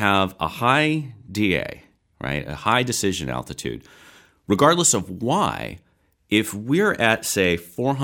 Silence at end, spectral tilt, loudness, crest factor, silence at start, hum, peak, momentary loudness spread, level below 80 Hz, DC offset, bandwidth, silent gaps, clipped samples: 0 s; -4 dB/octave; -21 LUFS; 20 dB; 0 s; none; -2 dBFS; 13 LU; -50 dBFS; under 0.1%; 18.5 kHz; none; under 0.1%